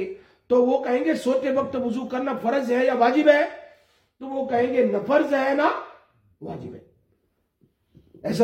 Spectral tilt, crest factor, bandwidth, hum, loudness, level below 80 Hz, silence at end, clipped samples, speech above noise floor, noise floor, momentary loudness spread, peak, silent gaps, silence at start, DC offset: -6 dB/octave; 20 dB; 15 kHz; none; -22 LUFS; -66 dBFS; 0 s; under 0.1%; 48 dB; -70 dBFS; 19 LU; -4 dBFS; none; 0 s; under 0.1%